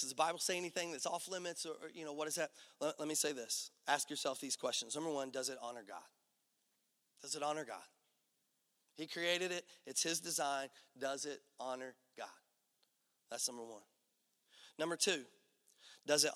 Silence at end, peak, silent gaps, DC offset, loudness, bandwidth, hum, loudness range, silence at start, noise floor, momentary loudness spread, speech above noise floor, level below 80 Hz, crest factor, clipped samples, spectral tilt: 0 s; -18 dBFS; none; under 0.1%; -40 LUFS; 17 kHz; none; 8 LU; 0 s; -82 dBFS; 16 LU; 41 dB; under -90 dBFS; 26 dB; under 0.1%; -1 dB/octave